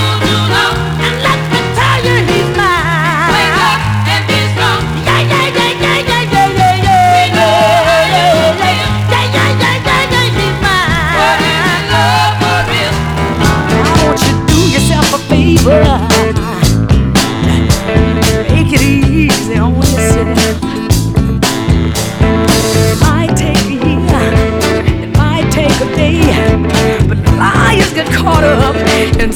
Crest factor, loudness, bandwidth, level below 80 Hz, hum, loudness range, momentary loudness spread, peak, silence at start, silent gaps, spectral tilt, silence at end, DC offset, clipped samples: 10 dB; -10 LUFS; over 20 kHz; -20 dBFS; none; 2 LU; 4 LU; 0 dBFS; 0 s; none; -5 dB/octave; 0 s; under 0.1%; 0.4%